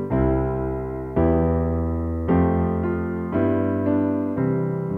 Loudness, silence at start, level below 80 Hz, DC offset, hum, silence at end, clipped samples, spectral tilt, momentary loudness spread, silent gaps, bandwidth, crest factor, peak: -22 LUFS; 0 s; -34 dBFS; under 0.1%; none; 0 s; under 0.1%; -11.5 dB/octave; 6 LU; none; 3.5 kHz; 14 dB; -8 dBFS